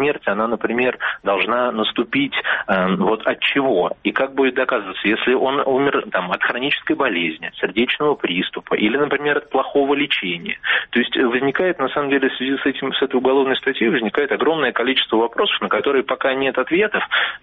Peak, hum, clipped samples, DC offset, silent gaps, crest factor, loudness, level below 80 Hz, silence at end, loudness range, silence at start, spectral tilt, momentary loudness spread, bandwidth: -4 dBFS; none; under 0.1%; under 0.1%; none; 16 dB; -19 LUFS; -58 dBFS; 0.05 s; 1 LU; 0 s; -2 dB/octave; 3 LU; 4.7 kHz